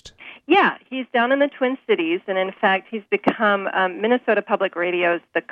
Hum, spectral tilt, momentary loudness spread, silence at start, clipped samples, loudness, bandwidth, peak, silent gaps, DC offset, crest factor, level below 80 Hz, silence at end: none; -6 dB/octave; 7 LU; 0.05 s; under 0.1%; -20 LUFS; 7.6 kHz; -4 dBFS; none; under 0.1%; 18 dB; -66 dBFS; 0.1 s